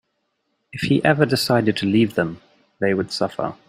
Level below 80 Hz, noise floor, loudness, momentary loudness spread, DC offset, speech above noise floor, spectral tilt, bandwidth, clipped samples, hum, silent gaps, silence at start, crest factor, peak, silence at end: -56 dBFS; -72 dBFS; -20 LUFS; 9 LU; under 0.1%; 53 dB; -6 dB/octave; 16 kHz; under 0.1%; none; none; 0.75 s; 20 dB; -2 dBFS; 0.15 s